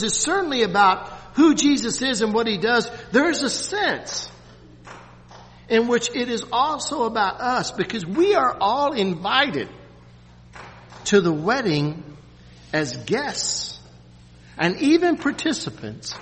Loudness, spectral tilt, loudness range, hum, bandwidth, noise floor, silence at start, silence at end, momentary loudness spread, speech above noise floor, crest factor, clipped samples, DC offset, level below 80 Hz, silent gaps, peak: -21 LUFS; -3.5 dB/octave; 5 LU; 60 Hz at -50 dBFS; 8.8 kHz; -47 dBFS; 0 s; 0 s; 13 LU; 26 dB; 20 dB; under 0.1%; under 0.1%; -52 dBFS; none; -4 dBFS